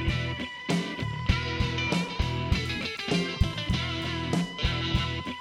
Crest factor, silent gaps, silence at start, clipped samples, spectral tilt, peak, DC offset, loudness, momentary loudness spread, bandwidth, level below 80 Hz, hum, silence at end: 18 dB; none; 0 s; under 0.1%; -5.5 dB/octave; -10 dBFS; under 0.1%; -29 LUFS; 4 LU; 13.5 kHz; -36 dBFS; none; 0 s